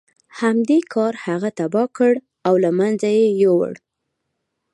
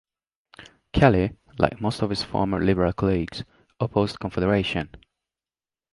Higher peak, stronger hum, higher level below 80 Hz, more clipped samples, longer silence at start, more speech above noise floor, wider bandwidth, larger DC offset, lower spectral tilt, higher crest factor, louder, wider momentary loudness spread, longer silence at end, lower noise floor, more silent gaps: about the same, -4 dBFS vs -2 dBFS; neither; second, -72 dBFS vs -42 dBFS; neither; second, 0.35 s vs 0.6 s; second, 59 dB vs over 67 dB; about the same, 11.5 kHz vs 11.5 kHz; neither; about the same, -7 dB/octave vs -7 dB/octave; second, 16 dB vs 22 dB; first, -18 LUFS vs -24 LUFS; second, 7 LU vs 12 LU; about the same, 1 s vs 0.95 s; second, -76 dBFS vs under -90 dBFS; neither